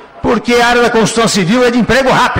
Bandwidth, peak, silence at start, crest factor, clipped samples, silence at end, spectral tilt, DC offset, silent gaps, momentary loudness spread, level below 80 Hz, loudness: 16.5 kHz; -4 dBFS; 0 s; 6 dB; under 0.1%; 0 s; -4 dB/octave; under 0.1%; none; 3 LU; -34 dBFS; -10 LUFS